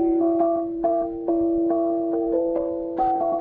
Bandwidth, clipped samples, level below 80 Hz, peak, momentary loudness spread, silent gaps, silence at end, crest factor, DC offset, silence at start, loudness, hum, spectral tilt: 2.5 kHz; under 0.1%; -50 dBFS; -10 dBFS; 4 LU; none; 0 s; 12 dB; under 0.1%; 0 s; -23 LUFS; none; -11 dB/octave